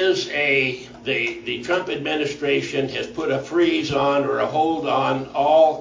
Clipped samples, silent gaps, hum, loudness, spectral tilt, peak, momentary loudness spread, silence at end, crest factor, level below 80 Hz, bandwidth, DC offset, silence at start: under 0.1%; none; none; -21 LUFS; -5 dB/octave; -4 dBFS; 7 LU; 0 s; 16 dB; -56 dBFS; 7.6 kHz; under 0.1%; 0 s